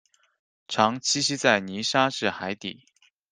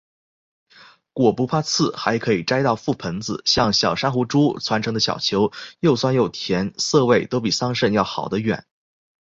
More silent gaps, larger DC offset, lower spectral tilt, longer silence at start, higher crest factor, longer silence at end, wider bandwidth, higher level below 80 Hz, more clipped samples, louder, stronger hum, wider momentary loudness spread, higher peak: neither; neither; second, -2.5 dB/octave vs -4.5 dB/octave; second, 0.7 s vs 1.15 s; first, 24 dB vs 18 dB; second, 0.6 s vs 0.8 s; first, 10.5 kHz vs 8 kHz; second, -68 dBFS vs -52 dBFS; neither; second, -24 LUFS vs -20 LUFS; neither; first, 10 LU vs 6 LU; about the same, -2 dBFS vs -2 dBFS